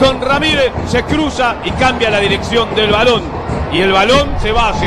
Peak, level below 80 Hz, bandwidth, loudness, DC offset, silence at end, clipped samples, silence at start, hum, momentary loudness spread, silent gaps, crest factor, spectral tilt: 0 dBFS; -26 dBFS; 13 kHz; -13 LUFS; under 0.1%; 0 s; under 0.1%; 0 s; none; 6 LU; none; 12 dB; -5 dB/octave